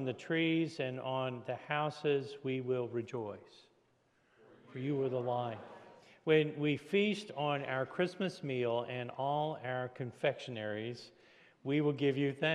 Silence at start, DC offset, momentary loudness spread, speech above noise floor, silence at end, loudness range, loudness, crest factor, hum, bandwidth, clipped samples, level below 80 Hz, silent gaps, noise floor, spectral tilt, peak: 0 s; under 0.1%; 11 LU; 37 dB; 0 s; 5 LU; -36 LUFS; 20 dB; none; 11 kHz; under 0.1%; -84 dBFS; none; -73 dBFS; -6.5 dB/octave; -16 dBFS